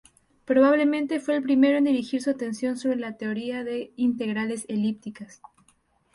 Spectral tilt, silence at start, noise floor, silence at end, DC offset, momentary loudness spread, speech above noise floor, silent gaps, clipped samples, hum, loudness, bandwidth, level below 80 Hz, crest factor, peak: -5.5 dB/octave; 0.5 s; -65 dBFS; 0.9 s; under 0.1%; 11 LU; 41 dB; none; under 0.1%; none; -25 LUFS; 11.5 kHz; -68 dBFS; 16 dB; -8 dBFS